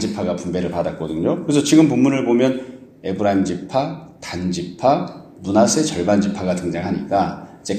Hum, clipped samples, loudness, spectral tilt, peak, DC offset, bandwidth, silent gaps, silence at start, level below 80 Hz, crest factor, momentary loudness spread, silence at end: none; under 0.1%; -19 LUFS; -5.5 dB/octave; -2 dBFS; under 0.1%; 14.5 kHz; none; 0 s; -50 dBFS; 18 dB; 13 LU; 0 s